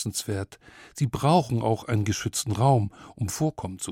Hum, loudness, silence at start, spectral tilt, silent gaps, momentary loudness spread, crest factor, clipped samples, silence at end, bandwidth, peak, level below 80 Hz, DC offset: none; -26 LUFS; 0 s; -5.5 dB/octave; none; 12 LU; 18 dB; under 0.1%; 0 s; 16.5 kHz; -8 dBFS; -54 dBFS; under 0.1%